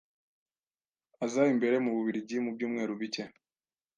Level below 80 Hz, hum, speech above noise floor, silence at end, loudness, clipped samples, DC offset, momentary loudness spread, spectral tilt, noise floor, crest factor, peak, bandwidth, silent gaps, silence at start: -84 dBFS; none; over 60 dB; 0.7 s; -31 LUFS; under 0.1%; under 0.1%; 11 LU; -5.5 dB/octave; under -90 dBFS; 20 dB; -14 dBFS; 9.2 kHz; none; 1.2 s